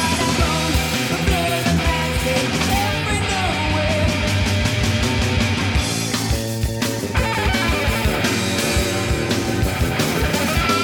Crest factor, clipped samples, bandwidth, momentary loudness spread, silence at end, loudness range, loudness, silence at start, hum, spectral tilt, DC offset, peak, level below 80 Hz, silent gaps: 14 dB; under 0.1%; over 20 kHz; 2 LU; 0 s; 1 LU; -19 LUFS; 0 s; none; -4.5 dB/octave; under 0.1%; -4 dBFS; -28 dBFS; none